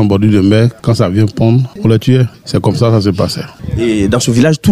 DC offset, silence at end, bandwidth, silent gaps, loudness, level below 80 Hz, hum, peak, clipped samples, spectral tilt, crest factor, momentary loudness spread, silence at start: under 0.1%; 0 s; 14 kHz; none; -11 LUFS; -34 dBFS; none; 0 dBFS; under 0.1%; -6.5 dB/octave; 10 dB; 6 LU; 0 s